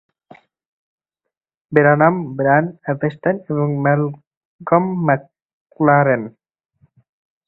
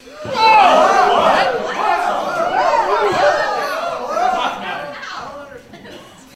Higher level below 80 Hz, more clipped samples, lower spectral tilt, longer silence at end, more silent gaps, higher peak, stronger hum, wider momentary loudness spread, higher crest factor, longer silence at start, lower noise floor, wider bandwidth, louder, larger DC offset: second, -60 dBFS vs -50 dBFS; neither; first, -11.5 dB/octave vs -3 dB/octave; first, 1.15 s vs 0.25 s; first, 4.27-4.31 s, 4.37-4.59 s, 5.42-5.66 s vs none; about the same, 0 dBFS vs 0 dBFS; neither; second, 9 LU vs 17 LU; about the same, 18 dB vs 16 dB; first, 1.7 s vs 0.05 s; first, -48 dBFS vs -38 dBFS; second, 4.1 kHz vs 15 kHz; about the same, -17 LUFS vs -15 LUFS; neither